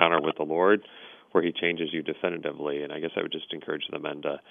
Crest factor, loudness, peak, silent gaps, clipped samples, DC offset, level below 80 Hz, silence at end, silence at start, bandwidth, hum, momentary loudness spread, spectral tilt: 26 dB; -28 LUFS; -2 dBFS; none; under 0.1%; under 0.1%; -72 dBFS; 0.1 s; 0 s; 3.8 kHz; none; 10 LU; -8 dB/octave